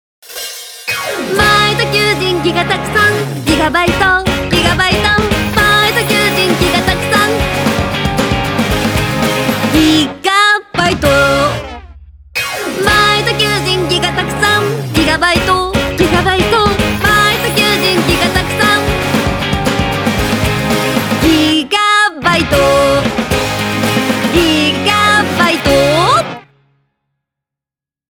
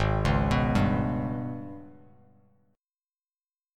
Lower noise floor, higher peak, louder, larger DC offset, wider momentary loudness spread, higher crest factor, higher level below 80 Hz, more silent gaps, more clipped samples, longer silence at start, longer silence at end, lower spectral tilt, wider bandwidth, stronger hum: about the same, -88 dBFS vs under -90 dBFS; first, 0 dBFS vs -12 dBFS; first, -11 LUFS vs -27 LUFS; neither; second, 5 LU vs 16 LU; second, 12 dB vs 18 dB; first, -30 dBFS vs -38 dBFS; neither; neither; first, 0.25 s vs 0 s; second, 1.7 s vs 1.85 s; second, -4 dB/octave vs -7.5 dB/octave; first, over 20 kHz vs 12 kHz; neither